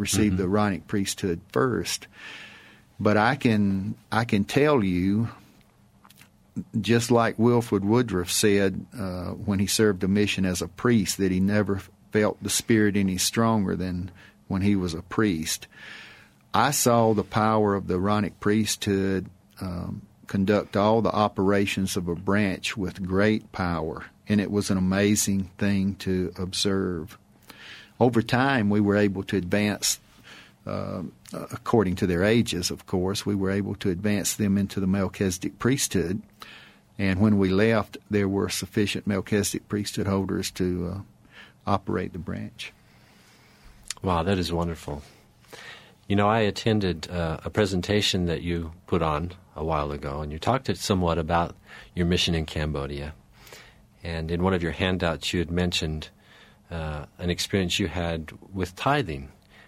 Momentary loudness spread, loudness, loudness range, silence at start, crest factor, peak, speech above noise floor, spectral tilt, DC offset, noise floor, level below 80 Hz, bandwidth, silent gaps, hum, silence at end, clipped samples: 14 LU; -25 LUFS; 5 LU; 0 s; 20 dB; -6 dBFS; 33 dB; -5 dB/octave; under 0.1%; -57 dBFS; -48 dBFS; 15.5 kHz; none; none; 0.4 s; under 0.1%